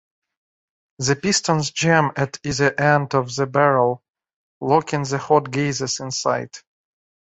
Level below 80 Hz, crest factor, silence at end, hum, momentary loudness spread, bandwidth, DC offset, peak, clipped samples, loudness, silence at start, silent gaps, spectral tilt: -56 dBFS; 20 dB; 0.7 s; none; 8 LU; 8.4 kHz; under 0.1%; -2 dBFS; under 0.1%; -20 LUFS; 1 s; 4.10-4.14 s, 4.36-4.61 s; -4.5 dB/octave